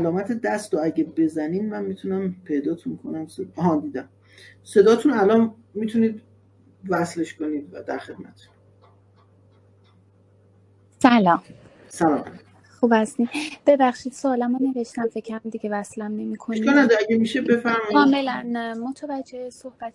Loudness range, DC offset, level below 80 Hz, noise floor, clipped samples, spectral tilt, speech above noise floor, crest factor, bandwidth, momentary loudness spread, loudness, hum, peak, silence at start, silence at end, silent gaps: 10 LU; under 0.1%; -66 dBFS; -56 dBFS; under 0.1%; -6 dB/octave; 34 dB; 22 dB; 12 kHz; 15 LU; -22 LUFS; none; -2 dBFS; 0 s; 0.05 s; none